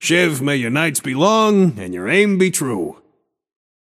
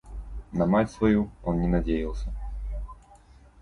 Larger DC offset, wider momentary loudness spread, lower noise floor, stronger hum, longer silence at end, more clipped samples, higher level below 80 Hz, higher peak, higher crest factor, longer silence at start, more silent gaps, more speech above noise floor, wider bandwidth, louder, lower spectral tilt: neither; second, 10 LU vs 16 LU; first, -63 dBFS vs -53 dBFS; neither; first, 1.05 s vs 0.65 s; neither; second, -62 dBFS vs -36 dBFS; first, 0 dBFS vs -10 dBFS; about the same, 16 dB vs 18 dB; about the same, 0 s vs 0.05 s; neither; first, 46 dB vs 28 dB; first, 15.5 kHz vs 11 kHz; first, -16 LUFS vs -27 LUFS; second, -4.5 dB/octave vs -8.5 dB/octave